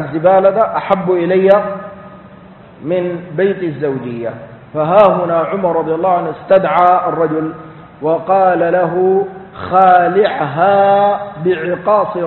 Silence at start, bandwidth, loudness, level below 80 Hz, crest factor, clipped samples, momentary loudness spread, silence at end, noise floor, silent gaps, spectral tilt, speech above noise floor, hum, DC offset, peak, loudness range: 0 s; 4.3 kHz; -13 LUFS; -52 dBFS; 14 dB; under 0.1%; 14 LU; 0 s; -38 dBFS; none; -9.5 dB/octave; 25 dB; none; under 0.1%; 0 dBFS; 4 LU